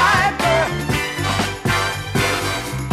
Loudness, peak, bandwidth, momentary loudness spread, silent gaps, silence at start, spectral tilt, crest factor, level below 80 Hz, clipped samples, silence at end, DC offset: -19 LUFS; -4 dBFS; 15.5 kHz; 5 LU; none; 0 s; -4 dB/octave; 16 dB; -36 dBFS; under 0.1%; 0 s; under 0.1%